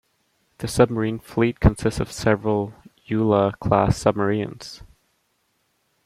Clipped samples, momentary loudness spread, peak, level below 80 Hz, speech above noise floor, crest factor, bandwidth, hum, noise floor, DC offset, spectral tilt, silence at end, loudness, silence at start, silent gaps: under 0.1%; 14 LU; -2 dBFS; -36 dBFS; 48 dB; 20 dB; 14.5 kHz; none; -69 dBFS; under 0.1%; -6.5 dB/octave; 1.2 s; -22 LUFS; 0.6 s; none